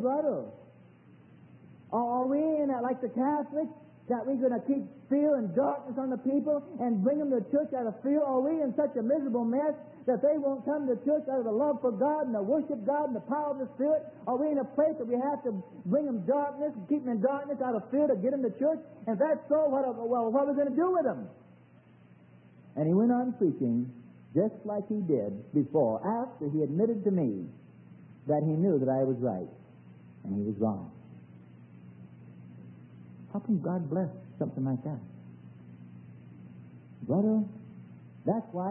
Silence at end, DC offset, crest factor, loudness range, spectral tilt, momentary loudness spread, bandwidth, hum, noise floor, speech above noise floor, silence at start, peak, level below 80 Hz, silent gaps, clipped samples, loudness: 0 s; under 0.1%; 16 dB; 6 LU; -13 dB/octave; 20 LU; 3.1 kHz; none; -57 dBFS; 28 dB; 0 s; -14 dBFS; -78 dBFS; none; under 0.1%; -30 LUFS